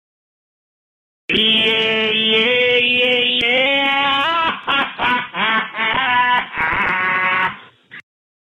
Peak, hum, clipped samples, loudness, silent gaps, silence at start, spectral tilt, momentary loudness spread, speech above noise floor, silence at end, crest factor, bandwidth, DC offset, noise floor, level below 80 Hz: -4 dBFS; none; under 0.1%; -15 LUFS; none; 1.3 s; -4 dB/octave; 5 LU; 24 dB; 0.5 s; 14 dB; 12.5 kHz; under 0.1%; -39 dBFS; -52 dBFS